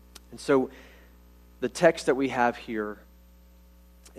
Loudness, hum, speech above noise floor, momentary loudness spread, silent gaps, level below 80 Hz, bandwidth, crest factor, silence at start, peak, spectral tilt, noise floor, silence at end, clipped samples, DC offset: -27 LUFS; 60 Hz at -50 dBFS; 28 dB; 15 LU; none; -54 dBFS; 14 kHz; 24 dB; 0.3 s; -6 dBFS; -5 dB/octave; -54 dBFS; 1.25 s; under 0.1%; under 0.1%